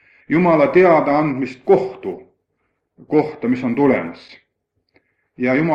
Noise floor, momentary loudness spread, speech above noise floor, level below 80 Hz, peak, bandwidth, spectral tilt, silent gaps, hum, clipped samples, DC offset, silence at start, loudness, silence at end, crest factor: -71 dBFS; 15 LU; 55 dB; -58 dBFS; -2 dBFS; 7.2 kHz; -9 dB/octave; none; none; under 0.1%; under 0.1%; 0.3 s; -17 LUFS; 0 s; 16 dB